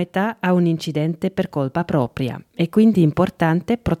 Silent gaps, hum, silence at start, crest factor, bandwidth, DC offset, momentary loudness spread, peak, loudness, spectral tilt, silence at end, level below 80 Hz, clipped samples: none; none; 0 s; 14 dB; 14.5 kHz; under 0.1%; 8 LU; -4 dBFS; -20 LUFS; -8 dB/octave; 0.05 s; -46 dBFS; under 0.1%